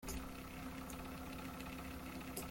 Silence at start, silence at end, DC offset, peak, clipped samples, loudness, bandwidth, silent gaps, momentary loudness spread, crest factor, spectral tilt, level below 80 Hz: 0 s; 0 s; under 0.1%; -30 dBFS; under 0.1%; -48 LUFS; 17 kHz; none; 2 LU; 18 dB; -4.5 dB/octave; -56 dBFS